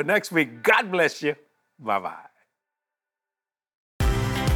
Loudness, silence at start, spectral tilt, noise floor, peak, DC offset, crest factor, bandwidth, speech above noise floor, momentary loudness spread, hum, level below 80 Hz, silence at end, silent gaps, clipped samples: -23 LUFS; 0 s; -5 dB/octave; under -90 dBFS; -6 dBFS; under 0.1%; 20 dB; 19.5 kHz; over 66 dB; 17 LU; none; -36 dBFS; 0 s; 3.75-4.00 s; under 0.1%